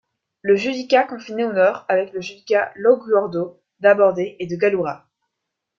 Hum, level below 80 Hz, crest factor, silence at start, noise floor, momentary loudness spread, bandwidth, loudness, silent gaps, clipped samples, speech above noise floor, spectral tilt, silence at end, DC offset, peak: none; -66 dBFS; 18 dB; 0.45 s; -80 dBFS; 12 LU; 7.2 kHz; -19 LUFS; none; under 0.1%; 62 dB; -6 dB/octave; 0.8 s; under 0.1%; -2 dBFS